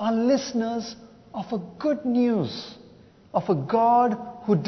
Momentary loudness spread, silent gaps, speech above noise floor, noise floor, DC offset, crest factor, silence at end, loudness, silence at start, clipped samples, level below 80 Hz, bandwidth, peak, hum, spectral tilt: 17 LU; none; 28 dB; -51 dBFS; under 0.1%; 16 dB; 0 s; -24 LUFS; 0 s; under 0.1%; -64 dBFS; 6.4 kHz; -10 dBFS; none; -6.5 dB/octave